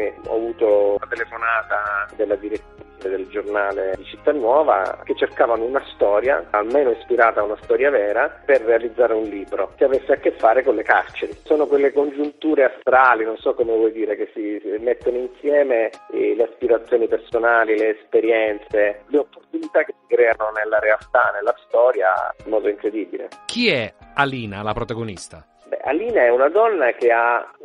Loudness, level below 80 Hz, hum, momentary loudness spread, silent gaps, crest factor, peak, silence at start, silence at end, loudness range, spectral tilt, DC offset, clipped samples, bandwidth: -19 LUFS; -52 dBFS; none; 10 LU; none; 18 dB; -2 dBFS; 0 s; 0 s; 4 LU; -5.5 dB/octave; under 0.1%; under 0.1%; 10.5 kHz